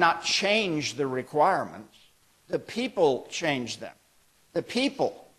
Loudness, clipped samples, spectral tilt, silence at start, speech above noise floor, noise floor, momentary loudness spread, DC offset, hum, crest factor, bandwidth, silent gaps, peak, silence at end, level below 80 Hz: -27 LUFS; under 0.1%; -3.5 dB/octave; 0 s; 36 dB; -63 dBFS; 13 LU; under 0.1%; none; 22 dB; 13 kHz; none; -6 dBFS; 0.2 s; -68 dBFS